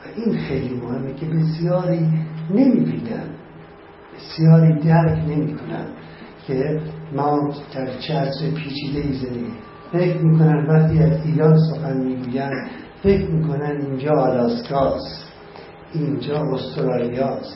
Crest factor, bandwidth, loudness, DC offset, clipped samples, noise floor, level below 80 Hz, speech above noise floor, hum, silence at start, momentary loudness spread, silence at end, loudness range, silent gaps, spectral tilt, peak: 18 dB; 5.8 kHz; -20 LUFS; under 0.1%; under 0.1%; -42 dBFS; -44 dBFS; 23 dB; none; 0 s; 16 LU; 0 s; 6 LU; none; -12.5 dB/octave; -2 dBFS